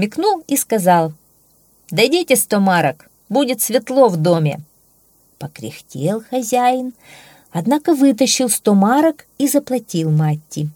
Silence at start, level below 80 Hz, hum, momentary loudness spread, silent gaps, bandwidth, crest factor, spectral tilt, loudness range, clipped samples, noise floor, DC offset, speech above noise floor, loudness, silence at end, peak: 0 s; -64 dBFS; none; 11 LU; none; 20 kHz; 16 dB; -5 dB/octave; 5 LU; under 0.1%; -55 dBFS; under 0.1%; 39 dB; -16 LUFS; 0.05 s; 0 dBFS